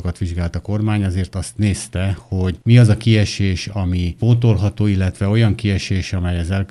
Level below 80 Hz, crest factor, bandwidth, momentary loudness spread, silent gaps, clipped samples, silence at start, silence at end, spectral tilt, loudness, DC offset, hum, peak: -36 dBFS; 16 dB; 11.5 kHz; 9 LU; none; under 0.1%; 0 s; 0.05 s; -6.5 dB/octave; -18 LUFS; under 0.1%; none; 0 dBFS